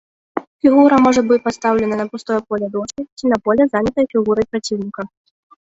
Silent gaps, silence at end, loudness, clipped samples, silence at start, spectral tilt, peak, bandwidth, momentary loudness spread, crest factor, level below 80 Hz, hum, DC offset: 0.47-0.59 s, 3.12-3.17 s; 0.6 s; -16 LUFS; under 0.1%; 0.35 s; -5.5 dB/octave; -2 dBFS; 8 kHz; 16 LU; 14 dB; -50 dBFS; none; under 0.1%